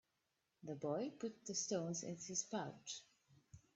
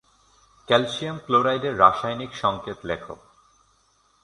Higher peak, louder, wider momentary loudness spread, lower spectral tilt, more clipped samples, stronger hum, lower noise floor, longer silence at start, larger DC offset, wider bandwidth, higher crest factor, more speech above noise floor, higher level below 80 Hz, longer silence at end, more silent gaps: second, -28 dBFS vs -2 dBFS; second, -45 LUFS vs -23 LUFS; second, 10 LU vs 14 LU; second, -3.5 dB/octave vs -5 dB/octave; neither; neither; first, -87 dBFS vs -63 dBFS; about the same, 0.65 s vs 0.7 s; neither; second, 8.2 kHz vs 11 kHz; about the same, 20 dB vs 24 dB; about the same, 42 dB vs 40 dB; second, -84 dBFS vs -56 dBFS; second, 0.2 s vs 1.1 s; neither